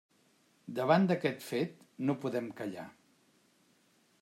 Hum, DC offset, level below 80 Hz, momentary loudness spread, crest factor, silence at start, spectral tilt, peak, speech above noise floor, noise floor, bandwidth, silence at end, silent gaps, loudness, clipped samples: none; under 0.1%; -82 dBFS; 17 LU; 24 dB; 0.65 s; -7 dB/octave; -12 dBFS; 37 dB; -70 dBFS; 16 kHz; 1.3 s; none; -33 LUFS; under 0.1%